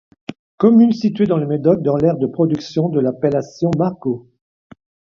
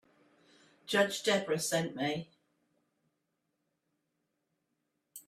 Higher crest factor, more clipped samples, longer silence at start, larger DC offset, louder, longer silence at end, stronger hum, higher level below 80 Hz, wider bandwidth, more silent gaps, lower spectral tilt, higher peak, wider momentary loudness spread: second, 16 dB vs 22 dB; neither; second, 0.3 s vs 0.85 s; neither; first, -17 LUFS vs -32 LUFS; first, 0.95 s vs 0.1 s; neither; first, -54 dBFS vs -80 dBFS; second, 7 kHz vs 15.5 kHz; first, 0.39-0.58 s vs none; first, -9 dB/octave vs -3.5 dB/octave; first, 0 dBFS vs -16 dBFS; second, 12 LU vs 24 LU